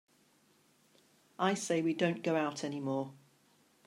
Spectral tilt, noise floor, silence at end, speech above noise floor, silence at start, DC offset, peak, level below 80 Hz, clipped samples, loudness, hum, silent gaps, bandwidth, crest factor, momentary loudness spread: -5 dB/octave; -69 dBFS; 0.7 s; 36 dB; 1.4 s; under 0.1%; -16 dBFS; -86 dBFS; under 0.1%; -34 LUFS; none; none; 13.5 kHz; 20 dB; 7 LU